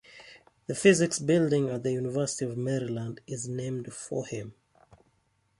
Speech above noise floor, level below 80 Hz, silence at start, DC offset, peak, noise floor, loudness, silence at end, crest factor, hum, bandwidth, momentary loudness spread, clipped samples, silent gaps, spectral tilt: 43 dB; -66 dBFS; 0.1 s; under 0.1%; -8 dBFS; -71 dBFS; -29 LUFS; 1.1 s; 22 dB; none; 11.5 kHz; 16 LU; under 0.1%; none; -5 dB/octave